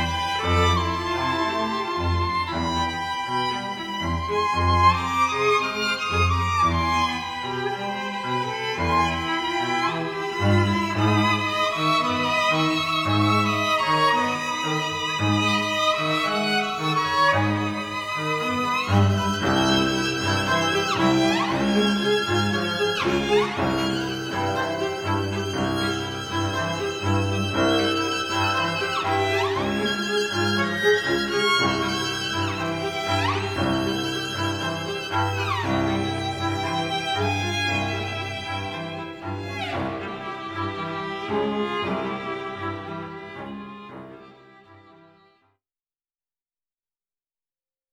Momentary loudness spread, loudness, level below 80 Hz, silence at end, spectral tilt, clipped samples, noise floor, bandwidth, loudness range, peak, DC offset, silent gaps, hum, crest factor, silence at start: 9 LU; -23 LUFS; -46 dBFS; 3.15 s; -4.5 dB/octave; under 0.1%; under -90 dBFS; 19 kHz; 7 LU; -6 dBFS; under 0.1%; none; none; 18 dB; 0 s